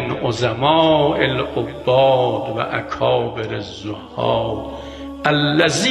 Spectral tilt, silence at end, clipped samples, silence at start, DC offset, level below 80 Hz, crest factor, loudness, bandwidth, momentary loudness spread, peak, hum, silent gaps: -5 dB/octave; 0 s; under 0.1%; 0 s; under 0.1%; -44 dBFS; 18 dB; -18 LUFS; 13 kHz; 14 LU; 0 dBFS; none; none